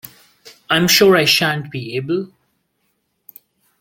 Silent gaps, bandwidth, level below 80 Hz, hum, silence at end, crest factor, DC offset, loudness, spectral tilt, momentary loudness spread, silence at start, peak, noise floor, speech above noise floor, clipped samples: none; 17 kHz; -56 dBFS; none; 1.55 s; 18 dB; under 0.1%; -15 LUFS; -3.5 dB/octave; 14 LU; 0.45 s; 0 dBFS; -68 dBFS; 53 dB; under 0.1%